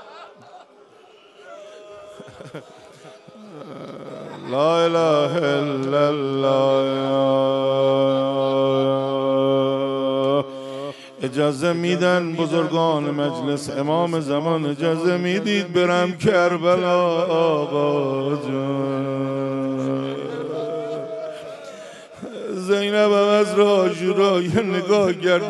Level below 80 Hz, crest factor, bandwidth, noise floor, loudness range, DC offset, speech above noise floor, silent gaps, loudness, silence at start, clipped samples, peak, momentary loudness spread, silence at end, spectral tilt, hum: -64 dBFS; 16 dB; 12 kHz; -49 dBFS; 7 LU; under 0.1%; 29 dB; none; -20 LUFS; 0 s; under 0.1%; -4 dBFS; 18 LU; 0 s; -6 dB/octave; none